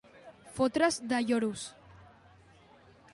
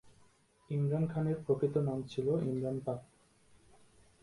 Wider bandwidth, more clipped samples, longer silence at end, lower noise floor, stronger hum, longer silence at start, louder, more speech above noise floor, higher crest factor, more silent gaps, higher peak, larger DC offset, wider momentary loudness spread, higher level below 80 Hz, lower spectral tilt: about the same, 11.5 kHz vs 11.5 kHz; neither; about the same, 1.1 s vs 1.2 s; second, -59 dBFS vs -67 dBFS; neither; about the same, 0.15 s vs 0.05 s; first, -30 LUFS vs -35 LUFS; second, 29 dB vs 33 dB; about the same, 20 dB vs 18 dB; neither; first, -14 dBFS vs -18 dBFS; neither; first, 18 LU vs 7 LU; about the same, -66 dBFS vs -66 dBFS; second, -4 dB/octave vs -9 dB/octave